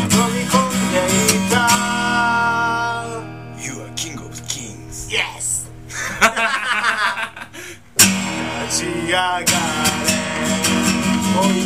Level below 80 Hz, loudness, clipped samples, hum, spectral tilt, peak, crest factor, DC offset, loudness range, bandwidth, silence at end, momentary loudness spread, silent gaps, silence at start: -44 dBFS; -17 LUFS; under 0.1%; none; -3 dB/octave; 0 dBFS; 18 dB; 0.4%; 6 LU; 15.5 kHz; 0 s; 14 LU; none; 0 s